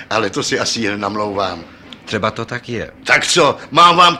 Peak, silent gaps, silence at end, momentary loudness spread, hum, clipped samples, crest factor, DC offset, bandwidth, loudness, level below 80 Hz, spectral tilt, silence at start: 0 dBFS; none; 0 s; 14 LU; none; under 0.1%; 16 dB; under 0.1%; 15 kHz; -15 LUFS; -50 dBFS; -3 dB/octave; 0 s